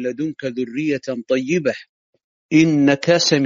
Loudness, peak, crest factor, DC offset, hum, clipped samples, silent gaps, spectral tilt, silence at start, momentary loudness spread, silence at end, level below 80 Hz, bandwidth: -19 LUFS; -2 dBFS; 18 dB; under 0.1%; none; under 0.1%; 1.89-2.13 s, 2.24-2.49 s; -4.5 dB/octave; 0 s; 10 LU; 0 s; -62 dBFS; 7.6 kHz